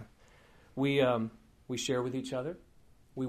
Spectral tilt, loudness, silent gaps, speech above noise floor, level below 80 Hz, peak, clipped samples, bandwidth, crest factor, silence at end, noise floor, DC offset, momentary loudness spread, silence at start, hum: -5 dB/octave; -33 LUFS; none; 31 dB; -64 dBFS; -16 dBFS; under 0.1%; 14.5 kHz; 18 dB; 0 s; -62 dBFS; under 0.1%; 18 LU; 0 s; none